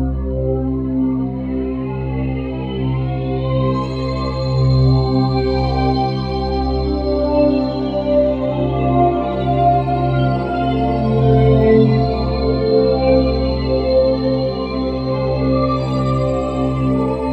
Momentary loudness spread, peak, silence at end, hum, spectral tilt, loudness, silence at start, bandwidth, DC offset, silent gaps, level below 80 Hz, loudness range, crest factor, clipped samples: 7 LU; 0 dBFS; 0 s; none; -9.5 dB/octave; -17 LUFS; 0 s; 5.4 kHz; under 0.1%; none; -26 dBFS; 6 LU; 16 dB; under 0.1%